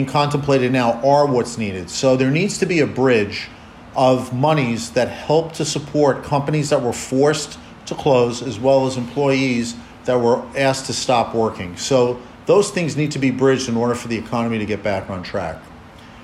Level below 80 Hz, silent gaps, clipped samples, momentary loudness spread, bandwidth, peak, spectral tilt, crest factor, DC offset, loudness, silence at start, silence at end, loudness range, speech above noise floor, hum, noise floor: -48 dBFS; none; under 0.1%; 9 LU; 14 kHz; -4 dBFS; -5.5 dB/octave; 14 dB; under 0.1%; -19 LUFS; 0 s; 0 s; 2 LU; 22 dB; none; -40 dBFS